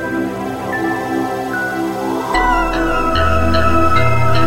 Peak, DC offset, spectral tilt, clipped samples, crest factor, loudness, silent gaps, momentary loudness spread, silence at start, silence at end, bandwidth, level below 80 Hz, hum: 0 dBFS; under 0.1%; -6 dB/octave; under 0.1%; 14 dB; -16 LUFS; none; 7 LU; 0 s; 0 s; 16 kHz; -28 dBFS; none